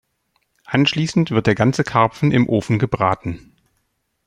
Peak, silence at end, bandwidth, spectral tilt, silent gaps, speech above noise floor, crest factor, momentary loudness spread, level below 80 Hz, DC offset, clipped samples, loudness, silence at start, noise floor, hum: -2 dBFS; 0.9 s; 11 kHz; -6.5 dB/octave; none; 52 dB; 18 dB; 6 LU; -48 dBFS; under 0.1%; under 0.1%; -18 LUFS; 0.7 s; -70 dBFS; none